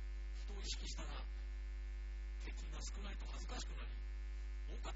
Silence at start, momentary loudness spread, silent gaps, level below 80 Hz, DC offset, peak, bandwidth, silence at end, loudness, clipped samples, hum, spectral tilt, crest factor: 0 s; 4 LU; none; -46 dBFS; under 0.1%; -32 dBFS; 7.6 kHz; 0 s; -49 LUFS; under 0.1%; none; -4 dB/octave; 14 dB